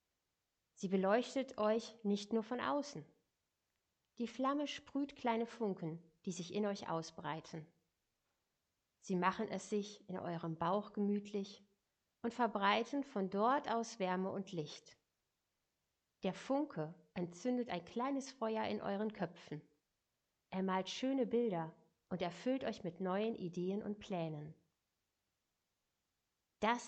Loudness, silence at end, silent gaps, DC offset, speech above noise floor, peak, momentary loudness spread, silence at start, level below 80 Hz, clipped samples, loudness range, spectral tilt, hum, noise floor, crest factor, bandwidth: -40 LUFS; 0 s; none; under 0.1%; 49 dB; -20 dBFS; 11 LU; 0.8 s; -80 dBFS; under 0.1%; 6 LU; -5.5 dB/octave; none; -88 dBFS; 22 dB; 8.8 kHz